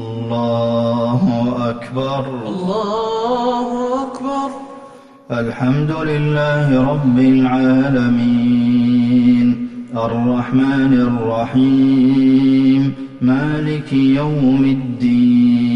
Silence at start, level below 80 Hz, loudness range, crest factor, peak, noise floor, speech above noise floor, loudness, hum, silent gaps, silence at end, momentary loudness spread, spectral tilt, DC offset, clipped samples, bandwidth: 0 s; -46 dBFS; 6 LU; 10 dB; -4 dBFS; -39 dBFS; 26 dB; -15 LUFS; none; none; 0 s; 10 LU; -8.5 dB/octave; under 0.1%; under 0.1%; 7.4 kHz